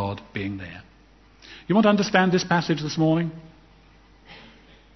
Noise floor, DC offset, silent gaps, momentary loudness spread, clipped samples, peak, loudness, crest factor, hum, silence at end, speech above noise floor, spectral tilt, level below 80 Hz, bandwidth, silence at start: -54 dBFS; under 0.1%; none; 24 LU; under 0.1%; -2 dBFS; -22 LUFS; 22 dB; none; 0.55 s; 32 dB; -6 dB/octave; -56 dBFS; 6.2 kHz; 0 s